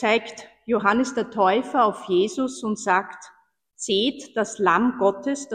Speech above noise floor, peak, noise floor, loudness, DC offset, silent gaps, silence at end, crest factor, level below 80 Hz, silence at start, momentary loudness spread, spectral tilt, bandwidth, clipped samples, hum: 23 dB; -4 dBFS; -45 dBFS; -22 LUFS; under 0.1%; none; 0 s; 18 dB; -64 dBFS; 0 s; 10 LU; -4 dB/octave; 10 kHz; under 0.1%; none